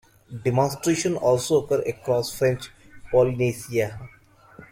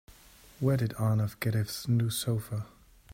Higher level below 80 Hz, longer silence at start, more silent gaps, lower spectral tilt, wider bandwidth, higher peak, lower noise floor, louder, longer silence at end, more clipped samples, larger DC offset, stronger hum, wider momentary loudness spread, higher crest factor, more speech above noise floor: first, -52 dBFS vs -58 dBFS; second, 0.3 s vs 0.6 s; neither; about the same, -5.5 dB/octave vs -6 dB/octave; about the same, 16.5 kHz vs 16 kHz; first, -6 dBFS vs -14 dBFS; second, -49 dBFS vs -56 dBFS; first, -24 LUFS vs -31 LUFS; about the same, 0.05 s vs 0 s; neither; neither; neither; about the same, 10 LU vs 8 LU; about the same, 18 dB vs 16 dB; about the same, 27 dB vs 26 dB